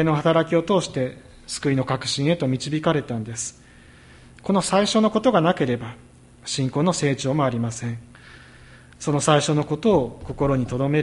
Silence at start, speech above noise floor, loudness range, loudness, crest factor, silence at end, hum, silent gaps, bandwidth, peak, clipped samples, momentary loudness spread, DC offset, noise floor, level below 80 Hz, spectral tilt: 0 s; 27 dB; 3 LU; -22 LUFS; 20 dB; 0 s; none; none; 11.5 kHz; -2 dBFS; under 0.1%; 12 LU; under 0.1%; -48 dBFS; -48 dBFS; -5.5 dB/octave